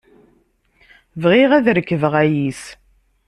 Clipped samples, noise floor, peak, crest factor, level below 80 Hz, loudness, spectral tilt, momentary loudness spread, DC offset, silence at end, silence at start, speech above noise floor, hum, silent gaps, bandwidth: under 0.1%; -59 dBFS; -2 dBFS; 16 dB; -54 dBFS; -16 LUFS; -6.5 dB/octave; 22 LU; under 0.1%; 0.55 s; 1.15 s; 44 dB; none; none; 12 kHz